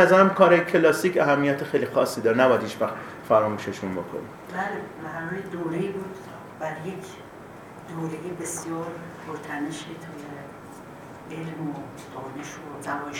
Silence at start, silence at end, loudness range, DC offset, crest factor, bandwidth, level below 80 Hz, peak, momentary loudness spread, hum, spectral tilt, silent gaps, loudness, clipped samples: 0 s; 0 s; 14 LU; under 0.1%; 24 dB; 19 kHz; -64 dBFS; -2 dBFS; 21 LU; none; -5.5 dB/octave; none; -25 LUFS; under 0.1%